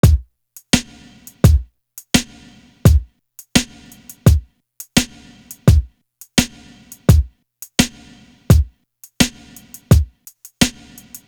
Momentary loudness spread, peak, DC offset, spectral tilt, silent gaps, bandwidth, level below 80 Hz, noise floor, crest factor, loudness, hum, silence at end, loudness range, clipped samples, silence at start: 21 LU; 0 dBFS; under 0.1%; -5 dB/octave; none; over 20 kHz; -22 dBFS; -48 dBFS; 18 dB; -17 LUFS; none; 0.6 s; 1 LU; under 0.1%; 0.05 s